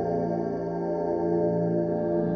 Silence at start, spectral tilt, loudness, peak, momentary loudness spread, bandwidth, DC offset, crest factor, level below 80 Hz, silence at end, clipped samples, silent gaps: 0 s; -11 dB/octave; -27 LUFS; -14 dBFS; 4 LU; 6.2 kHz; under 0.1%; 12 dB; -58 dBFS; 0 s; under 0.1%; none